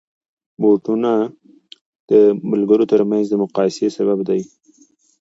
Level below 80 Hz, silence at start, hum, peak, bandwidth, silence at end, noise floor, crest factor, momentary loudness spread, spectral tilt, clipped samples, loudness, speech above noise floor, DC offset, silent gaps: -68 dBFS; 0.6 s; none; -2 dBFS; 7.8 kHz; 0.75 s; -54 dBFS; 16 dB; 8 LU; -7.5 dB/octave; under 0.1%; -17 LUFS; 39 dB; under 0.1%; 1.81-2.08 s